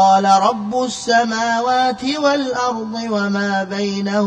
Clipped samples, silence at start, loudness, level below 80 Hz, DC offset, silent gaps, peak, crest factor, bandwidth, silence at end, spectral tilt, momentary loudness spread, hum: under 0.1%; 0 s; -17 LUFS; -58 dBFS; under 0.1%; none; -2 dBFS; 14 dB; 10.5 kHz; 0 s; -4 dB/octave; 7 LU; none